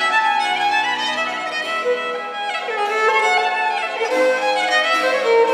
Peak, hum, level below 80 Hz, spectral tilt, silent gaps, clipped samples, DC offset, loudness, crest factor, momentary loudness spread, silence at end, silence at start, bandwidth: -4 dBFS; none; -80 dBFS; -1 dB/octave; none; under 0.1%; under 0.1%; -18 LUFS; 14 dB; 7 LU; 0 s; 0 s; 15 kHz